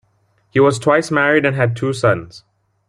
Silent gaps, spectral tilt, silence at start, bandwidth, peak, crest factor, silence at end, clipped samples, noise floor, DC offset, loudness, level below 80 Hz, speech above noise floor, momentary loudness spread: none; -6 dB/octave; 0.55 s; 11.5 kHz; -2 dBFS; 16 dB; 0.5 s; under 0.1%; -60 dBFS; under 0.1%; -16 LUFS; -54 dBFS; 45 dB; 5 LU